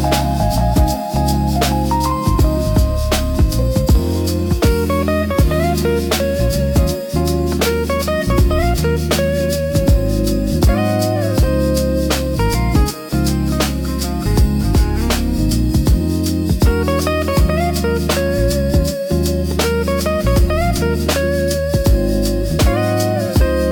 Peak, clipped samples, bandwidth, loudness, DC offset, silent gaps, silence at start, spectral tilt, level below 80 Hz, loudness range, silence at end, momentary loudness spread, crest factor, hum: -2 dBFS; under 0.1%; 18 kHz; -16 LUFS; under 0.1%; none; 0 s; -6 dB/octave; -20 dBFS; 1 LU; 0 s; 3 LU; 12 dB; none